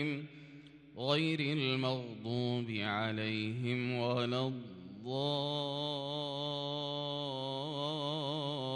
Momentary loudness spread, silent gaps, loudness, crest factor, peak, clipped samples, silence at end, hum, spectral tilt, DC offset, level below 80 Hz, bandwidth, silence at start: 10 LU; none; -36 LUFS; 18 dB; -18 dBFS; under 0.1%; 0 s; none; -6.5 dB/octave; under 0.1%; -76 dBFS; 10.5 kHz; 0 s